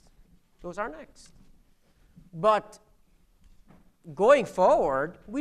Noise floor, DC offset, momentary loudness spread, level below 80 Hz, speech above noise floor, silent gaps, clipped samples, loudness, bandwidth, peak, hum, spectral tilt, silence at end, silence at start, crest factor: -61 dBFS; under 0.1%; 24 LU; -56 dBFS; 36 dB; none; under 0.1%; -25 LUFS; 11.5 kHz; -6 dBFS; none; -5.5 dB/octave; 0 s; 0.65 s; 22 dB